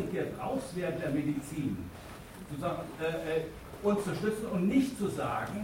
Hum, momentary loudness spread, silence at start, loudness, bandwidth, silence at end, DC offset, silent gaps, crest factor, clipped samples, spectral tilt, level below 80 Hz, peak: none; 13 LU; 0 s; -34 LUFS; 16.5 kHz; 0 s; under 0.1%; none; 16 dB; under 0.1%; -6.5 dB/octave; -56 dBFS; -16 dBFS